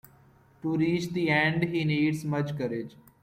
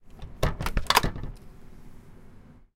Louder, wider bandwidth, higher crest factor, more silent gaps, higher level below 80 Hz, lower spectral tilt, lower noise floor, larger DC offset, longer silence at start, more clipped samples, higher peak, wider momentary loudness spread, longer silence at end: about the same, -28 LUFS vs -27 LUFS; about the same, 15.5 kHz vs 17 kHz; second, 16 dB vs 30 dB; neither; second, -62 dBFS vs -36 dBFS; first, -6.5 dB/octave vs -3.5 dB/octave; first, -58 dBFS vs -49 dBFS; neither; first, 0.65 s vs 0.05 s; neither; second, -12 dBFS vs 0 dBFS; second, 11 LU vs 23 LU; about the same, 0.35 s vs 0.25 s